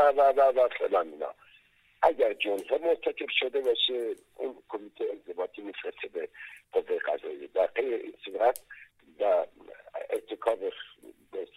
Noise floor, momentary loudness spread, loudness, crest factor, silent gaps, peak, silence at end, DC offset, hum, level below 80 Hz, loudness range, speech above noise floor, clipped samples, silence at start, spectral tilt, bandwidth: -62 dBFS; 16 LU; -29 LUFS; 20 dB; none; -8 dBFS; 0.1 s; under 0.1%; none; -72 dBFS; 6 LU; 33 dB; under 0.1%; 0 s; -2.5 dB/octave; 14.5 kHz